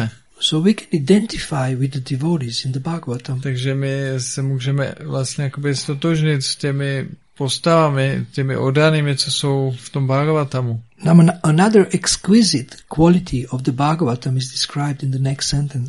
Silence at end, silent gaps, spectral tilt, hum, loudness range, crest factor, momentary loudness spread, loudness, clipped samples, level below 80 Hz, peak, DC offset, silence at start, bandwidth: 0 s; none; -5.5 dB/octave; none; 6 LU; 18 dB; 10 LU; -18 LUFS; under 0.1%; -44 dBFS; 0 dBFS; 0.2%; 0 s; 11.5 kHz